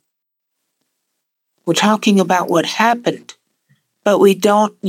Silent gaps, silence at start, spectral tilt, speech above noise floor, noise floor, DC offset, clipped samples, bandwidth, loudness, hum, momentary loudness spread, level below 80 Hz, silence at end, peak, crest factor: none; 1.65 s; -4.5 dB/octave; 63 dB; -77 dBFS; under 0.1%; under 0.1%; 16.5 kHz; -14 LUFS; none; 10 LU; -76 dBFS; 0 s; 0 dBFS; 16 dB